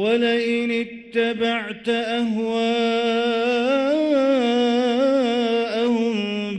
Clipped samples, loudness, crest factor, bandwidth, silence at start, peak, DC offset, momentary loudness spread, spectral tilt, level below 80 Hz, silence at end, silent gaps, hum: under 0.1%; -21 LUFS; 12 dB; 9.2 kHz; 0 s; -8 dBFS; under 0.1%; 5 LU; -5 dB/octave; -64 dBFS; 0 s; none; none